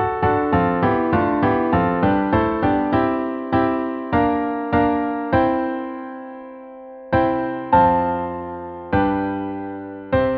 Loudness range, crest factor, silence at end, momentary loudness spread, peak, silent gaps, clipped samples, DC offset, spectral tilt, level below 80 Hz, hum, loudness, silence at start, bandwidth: 3 LU; 18 dB; 0 s; 14 LU; -2 dBFS; none; under 0.1%; under 0.1%; -10.5 dB/octave; -40 dBFS; none; -20 LUFS; 0 s; 5.2 kHz